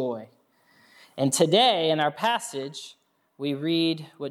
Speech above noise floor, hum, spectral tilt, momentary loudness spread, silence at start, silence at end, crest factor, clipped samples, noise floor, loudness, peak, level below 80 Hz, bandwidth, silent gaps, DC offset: 37 dB; none; -4 dB/octave; 19 LU; 0 s; 0 s; 20 dB; under 0.1%; -61 dBFS; -24 LUFS; -6 dBFS; -82 dBFS; 15.5 kHz; none; under 0.1%